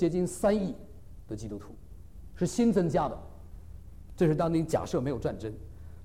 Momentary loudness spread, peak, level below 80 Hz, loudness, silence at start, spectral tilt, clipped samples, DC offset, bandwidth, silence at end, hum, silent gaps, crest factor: 24 LU; -14 dBFS; -48 dBFS; -29 LUFS; 0 s; -7 dB/octave; under 0.1%; 0.3%; 15.5 kHz; 0 s; none; none; 16 dB